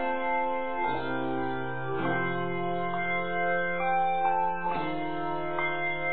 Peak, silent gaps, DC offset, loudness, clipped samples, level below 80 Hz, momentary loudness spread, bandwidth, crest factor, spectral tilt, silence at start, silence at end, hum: -16 dBFS; none; 1%; -29 LUFS; under 0.1%; -56 dBFS; 6 LU; 4.5 kHz; 14 dB; -4 dB/octave; 0 s; 0 s; none